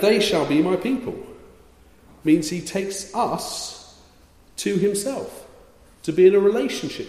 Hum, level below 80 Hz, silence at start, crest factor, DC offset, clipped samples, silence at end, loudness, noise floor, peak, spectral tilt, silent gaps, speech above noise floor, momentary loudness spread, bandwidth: none; -56 dBFS; 0 s; 18 dB; under 0.1%; under 0.1%; 0 s; -21 LUFS; -52 dBFS; -4 dBFS; -4.5 dB/octave; none; 31 dB; 19 LU; 15 kHz